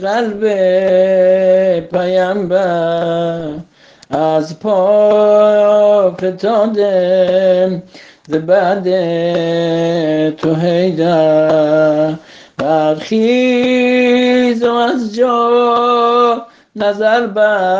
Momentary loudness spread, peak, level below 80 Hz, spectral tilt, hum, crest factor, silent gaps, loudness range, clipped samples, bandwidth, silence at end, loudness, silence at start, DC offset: 8 LU; 0 dBFS; -56 dBFS; -6.5 dB/octave; none; 12 dB; none; 3 LU; under 0.1%; 7.6 kHz; 0 s; -12 LUFS; 0 s; under 0.1%